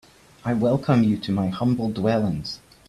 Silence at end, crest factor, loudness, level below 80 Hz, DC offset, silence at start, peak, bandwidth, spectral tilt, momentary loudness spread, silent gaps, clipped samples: 0.35 s; 16 dB; -23 LUFS; -52 dBFS; under 0.1%; 0.45 s; -8 dBFS; 12.5 kHz; -8 dB/octave; 10 LU; none; under 0.1%